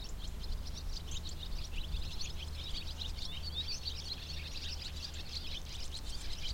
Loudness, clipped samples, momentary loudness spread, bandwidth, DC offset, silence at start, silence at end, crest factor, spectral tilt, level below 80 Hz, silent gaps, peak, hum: -42 LUFS; under 0.1%; 5 LU; 16.5 kHz; under 0.1%; 0 s; 0 s; 14 dB; -3 dB/octave; -44 dBFS; none; -26 dBFS; none